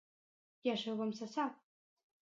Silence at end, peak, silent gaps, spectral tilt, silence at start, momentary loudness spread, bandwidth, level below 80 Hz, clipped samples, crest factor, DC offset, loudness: 0.8 s; -22 dBFS; none; -5 dB/octave; 0.65 s; 3 LU; 7.6 kHz; under -90 dBFS; under 0.1%; 20 dB; under 0.1%; -40 LUFS